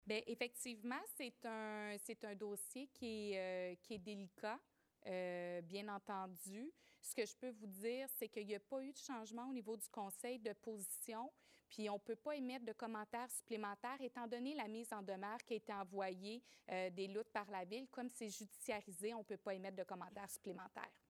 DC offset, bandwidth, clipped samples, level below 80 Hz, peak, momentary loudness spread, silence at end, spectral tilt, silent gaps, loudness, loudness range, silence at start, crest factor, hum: under 0.1%; 16 kHz; under 0.1%; -90 dBFS; -28 dBFS; 6 LU; 0.15 s; -3.5 dB/octave; none; -49 LUFS; 2 LU; 0.05 s; 20 dB; none